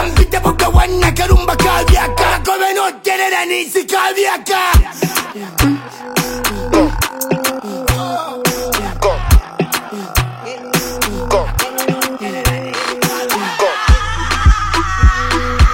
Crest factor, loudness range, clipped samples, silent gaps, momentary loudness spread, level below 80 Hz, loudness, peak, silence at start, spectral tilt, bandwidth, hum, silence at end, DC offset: 14 dB; 4 LU; under 0.1%; none; 6 LU; -18 dBFS; -15 LUFS; 0 dBFS; 0 s; -4.5 dB/octave; 17 kHz; none; 0 s; under 0.1%